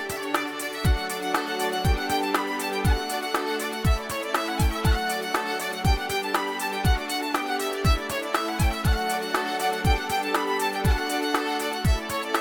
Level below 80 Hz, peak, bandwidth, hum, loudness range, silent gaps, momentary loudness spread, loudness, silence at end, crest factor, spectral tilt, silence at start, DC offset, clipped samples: -30 dBFS; -10 dBFS; 19.5 kHz; none; 1 LU; none; 3 LU; -26 LUFS; 0 s; 16 dB; -4.5 dB/octave; 0 s; under 0.1%; under 0.1%